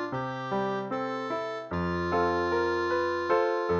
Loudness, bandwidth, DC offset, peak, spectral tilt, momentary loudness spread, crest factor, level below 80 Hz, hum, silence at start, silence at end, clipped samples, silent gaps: -29 LUFS; 7 kHz; under 0.1%; -14 dBFS; -6.5 dB/octave; 6 LU; 16 dB; -56 dBFS; none; 0 s; 0 s; under 0.1%; none